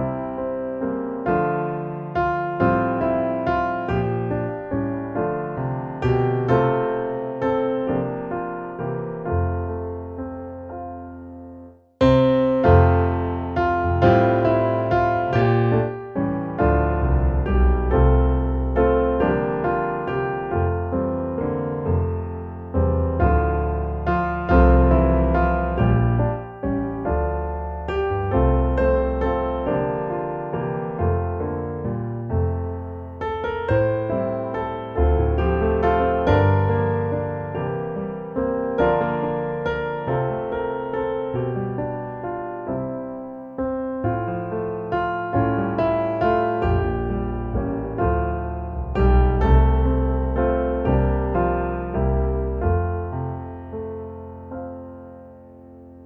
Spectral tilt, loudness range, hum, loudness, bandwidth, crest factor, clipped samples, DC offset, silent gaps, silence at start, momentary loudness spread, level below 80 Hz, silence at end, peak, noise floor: -10 dB/octave; 7 LU; none; -22 LUFS; 5.2 kHz; 20 dB; under 0.1%; under 0.1%; none; 0 s; 11 LU; -28 dBFS; 0 s; -2 dBFS; -43 dBFS